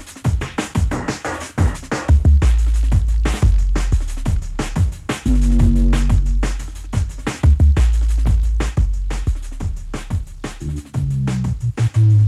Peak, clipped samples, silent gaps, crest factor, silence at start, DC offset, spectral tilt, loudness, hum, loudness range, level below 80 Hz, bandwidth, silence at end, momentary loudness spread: -2 dBFS; under 0.1%; none; 12 dB; 0 s; under 0.1%; -6.5 dB/octave; -19 LUFS; none; 5 LU; -18 dBFS; 12 kHz; 0 s; 11 LU